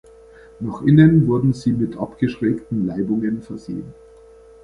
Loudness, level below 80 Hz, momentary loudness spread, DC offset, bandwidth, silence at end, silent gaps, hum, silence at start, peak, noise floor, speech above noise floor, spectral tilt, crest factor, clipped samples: -18 LUFS; -48 dBFS; 18 LU; under 0.1%; 9.8 kHz; 0.7 s; none; none; 0.6 s; -2 dBFS; -45 dBFS; 27 dB; -9 dB/octave; 18 dB; under 0.1%